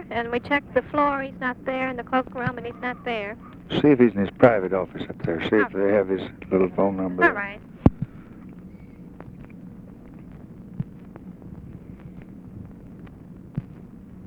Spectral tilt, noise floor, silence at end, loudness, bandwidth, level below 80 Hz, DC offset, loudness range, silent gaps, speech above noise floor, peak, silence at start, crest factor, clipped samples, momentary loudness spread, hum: -8.5 dB/octave; -43 dBFS; 0 s; -23 LUFS; 7 kHz; -48 dBFS; under 0.1%; 19 LU; none; 20 dB; 0 dBFS; 0 s; 24 dB; under 0.1%; 24 LU; none